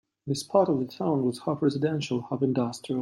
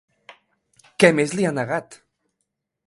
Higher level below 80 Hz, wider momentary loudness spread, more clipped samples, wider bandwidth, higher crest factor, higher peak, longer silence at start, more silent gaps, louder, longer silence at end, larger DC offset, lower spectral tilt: about the same, -68 dBFS vs -64 dBFS; second, 6 LU vs 12 LU; neither; first, 14 kHz vs 11.5 kHz; second, 18 dB vs 24 dB; second, -8 dBFS vs 0 dBFS; second, 0.25 s vs 1 s; neither; second, -27 LUFS vs -20 LUFS; second, 0 s vs 0.95 s; neither; first, -6.5 dB/octave vs -5 dB/octave